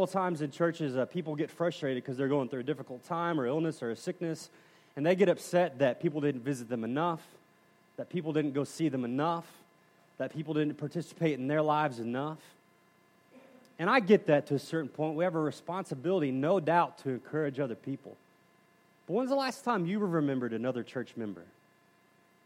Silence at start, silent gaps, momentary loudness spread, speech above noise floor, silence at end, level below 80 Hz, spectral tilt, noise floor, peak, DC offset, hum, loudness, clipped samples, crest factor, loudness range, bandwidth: 0 s; none; 11 LU; 34 dB; 1 s; -84 dBFS; -6.5 dB/octave; -66 dBFS; -10 dBFS; under 0.1%; none; -32 LUFS; under 0.1%; 22 dB; 4 LU; 15.5 kHz